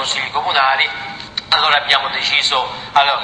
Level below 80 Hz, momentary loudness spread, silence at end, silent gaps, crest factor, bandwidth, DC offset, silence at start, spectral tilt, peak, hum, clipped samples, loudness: -52 dBFS; 7 LU; 0 s; none; 16 dB; 10 kHz; under 0.1%; 0 s; -0.5 dB/octave; 0 dBFS; none; under 0.1%; -15 LUFS